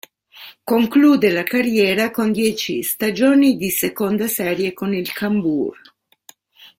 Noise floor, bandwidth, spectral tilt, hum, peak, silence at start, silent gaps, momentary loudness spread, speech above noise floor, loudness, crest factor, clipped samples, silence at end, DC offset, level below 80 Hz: -50 dBFS; 16.5 kHz; -4.5 dB/octave; none; -2 dBFS; 0.35 s; none; 8 LU; 33 dB; -18 LUFS; 16 dB; under 0.1%; 0.15 s; under 0.1%; -58 dBFS